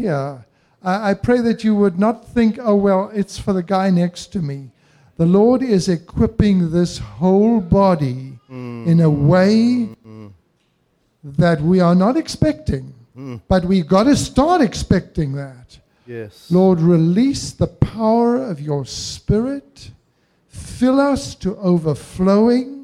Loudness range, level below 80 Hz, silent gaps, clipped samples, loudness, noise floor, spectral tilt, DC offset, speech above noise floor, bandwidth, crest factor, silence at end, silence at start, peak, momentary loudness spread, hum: 4 LU; -38 dBFS; none; under 0.1%; -17 LUFS; -63 dBFS; -7 dB/octave; under 0.1%; 47 dB; 12 kHz; 16 dB; 0 s; 0 s; 0 dBFS; 14 LU; none